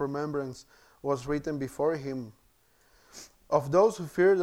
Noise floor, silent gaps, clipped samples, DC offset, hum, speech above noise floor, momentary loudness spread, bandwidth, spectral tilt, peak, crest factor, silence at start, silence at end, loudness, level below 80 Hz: -65 dBFS; none; under 0.1%; under 0.1%; none; 37 dB; 24 LU; 15.5 kHz; -6.5 dB/octave; -10 dBFS; 20 dB; 0 s; 0 s; -29 LUFS; -58 dBFS